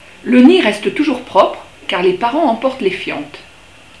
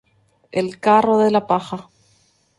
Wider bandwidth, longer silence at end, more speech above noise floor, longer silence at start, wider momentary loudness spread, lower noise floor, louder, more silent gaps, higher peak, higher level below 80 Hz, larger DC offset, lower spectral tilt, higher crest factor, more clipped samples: about the same, 11 kHz vs 11.5 kHz; second, 0.6 s vs 0.75 s; second, 29 dB vs 43 dB; second, 0.25 s vs 0.55 s; about the same, 14 LU vs 15 LU; second, -42 dBFS vs -60 dBFS; first, -14 LUFS vs -18 LUFS; neither; about the same, 0 dBFS vs -2 dBFS; first, -52 dBFS vs -60 dBFS; first, 0.4% vs under 0.1%; second, -5 dB/octave vs -6.5 dB/octave; about the same, 14 dB vs 18 dB; first, 0.2% vs under 0.1%